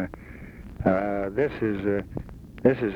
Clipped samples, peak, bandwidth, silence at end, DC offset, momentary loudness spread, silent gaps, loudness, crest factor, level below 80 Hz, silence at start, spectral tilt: under 0.1%; -6 dBFS; 7.8 kHz; 0 s; under 0.1%; 19 LU; none; -26 LUFS; 20 dB; -46 dBFS; 0 s; -9 dB/octave